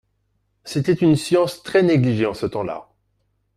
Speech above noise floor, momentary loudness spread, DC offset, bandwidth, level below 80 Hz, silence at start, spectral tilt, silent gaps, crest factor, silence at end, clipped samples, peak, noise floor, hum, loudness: 50 dB; 11 LU; under 0.1%; 14.5 kHz; -54 dBFS; 0.65 s; -6.5 dB/octave; none; 16 dB; 0.75 s; under 0.1%; -4 dBFS; -68 dBFS; none; -19 LUFS